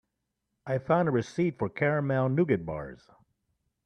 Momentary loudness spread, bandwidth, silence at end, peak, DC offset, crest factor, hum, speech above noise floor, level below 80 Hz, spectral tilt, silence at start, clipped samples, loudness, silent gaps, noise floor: 12 LU; 9.6 kHz; 0.9 s; -10 dBFS; under 0.1%; 20 dB; none; 54 dB; -62 dBFS; -8.5 dB/octave; 0.65 s; under 0.1%; -28 LUFS; none; -82 dBFS